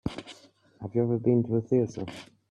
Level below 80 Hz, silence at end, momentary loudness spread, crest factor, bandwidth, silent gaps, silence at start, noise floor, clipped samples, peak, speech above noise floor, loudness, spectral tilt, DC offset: -58 dBFS; 0.25 s; 18 LU; 16 dB; 10 kHz; none; 0.05 s; -55 dBFS; under 0.1%; -12 dBFS; 29 dB; -28 LUFS; -8.5 dB/octave; under 0.1%